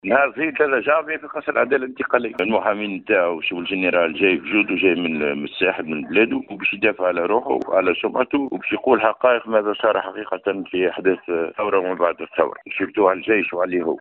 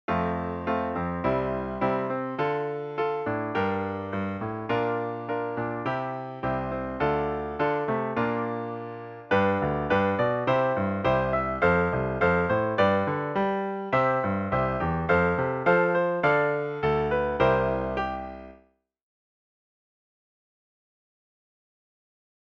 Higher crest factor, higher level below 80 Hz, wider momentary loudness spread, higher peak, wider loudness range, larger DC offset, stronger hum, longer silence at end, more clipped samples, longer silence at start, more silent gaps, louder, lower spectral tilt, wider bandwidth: about the same, 20 dB vs 18 dB; second, -62 dBFS vs -48 dBFS; about the same, 6 LU vs 8 LU; first, 0 dBFS vs -10 dBFS; second, 2 LU vs 5 LU; neither; neither; second, 0 s vs 3.95 s; neither; about the same, 0.05 s vs 0.1 s; neither; first, -20 LUFS vs -26 LUFS; second, -2.5 dB/octave vs -8.5 dB/octave; second, 4.3 kHz vs 7 kHz